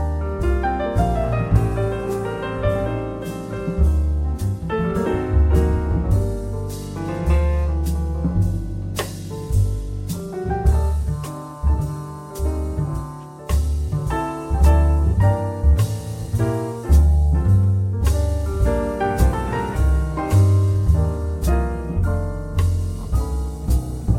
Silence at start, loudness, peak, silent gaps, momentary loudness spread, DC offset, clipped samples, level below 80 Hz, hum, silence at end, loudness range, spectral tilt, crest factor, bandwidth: 0 s; -21 LUFS; -4 dBFS; none; 10 LU; under 0.1%; under 0.1%; -22 dBFS; none; 0 s; 5 LU; -7.5 dB/octave; 16 dB; 15.5 kHz